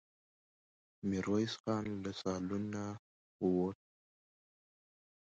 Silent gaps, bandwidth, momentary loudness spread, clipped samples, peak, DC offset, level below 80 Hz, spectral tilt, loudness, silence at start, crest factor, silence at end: 1.60-1.64 s, 2.99-3.39 s; 8 kHz; 9 LU; under 0.1%; -22 dBFS; under 0.1%; -66 dBFS; -6.5 dB/octave; -38 LUFS; 1.05 s; 18 dB; 1.6 s